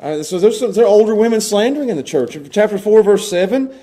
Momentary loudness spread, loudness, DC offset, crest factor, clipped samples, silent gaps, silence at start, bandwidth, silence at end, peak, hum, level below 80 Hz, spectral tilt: 9 LU; -14 LUFS; under 0.1%; 14 dB; under 0.1%; none; 0 s; 15.5 kHz; 0.1 s; 0 dBFS; none; -58 dBFS; -4.5 dB/octave